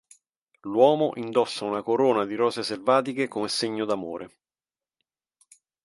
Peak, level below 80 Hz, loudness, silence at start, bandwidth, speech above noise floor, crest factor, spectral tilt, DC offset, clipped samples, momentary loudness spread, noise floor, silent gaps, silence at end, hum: -6 dBFS; -72 dBFS; -25 LUFS; 0.65 s; 11.5 kHz; over 66 dB; 20 dB; -4.5 dB/octave; under 0.1%; under 0.1%; 11 LU; under -90 dBFS; none; 1.6 s; none